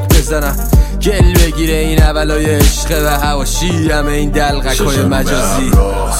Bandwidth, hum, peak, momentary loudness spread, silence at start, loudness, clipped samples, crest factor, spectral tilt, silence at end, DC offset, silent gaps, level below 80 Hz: 16.5 kHz; none; 0 dBFS; 4 LU; 0 s; -13 LUFS; under 0.1%; 10 dB; -5 dB/octave; 0 s; under 0.1%; none; -14 dBFS